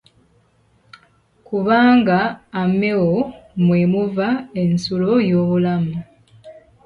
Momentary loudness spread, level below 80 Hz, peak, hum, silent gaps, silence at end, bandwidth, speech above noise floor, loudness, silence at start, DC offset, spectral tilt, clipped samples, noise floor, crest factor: 9 LU; -52 dBFS; -4 dBFS; none; none; 0.3 s; 7 kHz; 41 dB; -18 LUFS; 1.5 s; under 0.1%; -8 dB/octave; under 0.1%; -58 dBFS; 16 dB